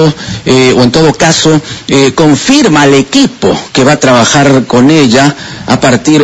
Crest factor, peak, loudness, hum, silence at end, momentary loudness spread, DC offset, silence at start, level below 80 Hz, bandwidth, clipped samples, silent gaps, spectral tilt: 6 dB; 0 dBFS; -6 LUFS; none; 0 s; 6 LU; under 0.1%; 0 s; -36 dBFS; 11 kHz; 4%; none; -4.5 dB/octave